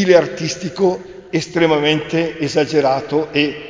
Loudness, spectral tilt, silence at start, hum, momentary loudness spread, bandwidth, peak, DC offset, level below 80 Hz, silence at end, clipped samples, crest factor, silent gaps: -17 LUFS; -5 dB/octave; 0 s; none; 9 LU; 7.6 kHz; 0 dBFS; under 0.1%; -52 dBFS; 0 s; under 0.1%; 16 dB; none